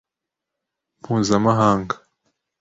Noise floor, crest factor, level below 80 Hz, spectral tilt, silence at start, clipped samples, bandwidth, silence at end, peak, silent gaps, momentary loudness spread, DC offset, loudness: -85 dBFS; 20 dB; -52 dBFS; -6 dB/octave; 1.1 s; under 0.1%; 8 kHz; 0.65 s; -4 dBFS; none; 13 LU; under 0.1%; -19 LUFS